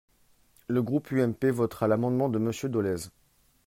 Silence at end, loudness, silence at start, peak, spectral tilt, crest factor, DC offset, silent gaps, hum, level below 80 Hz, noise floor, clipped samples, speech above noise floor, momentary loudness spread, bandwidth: 0.6 s; -28 LUFS; 0.7 s; -12 dBFS; -7.5 dB/octave; 16 dB; under 0.1%; none; none; -64 dBFS; -64 dBFS; under 0.1%; 37 dB; 7 LU; 16 kHz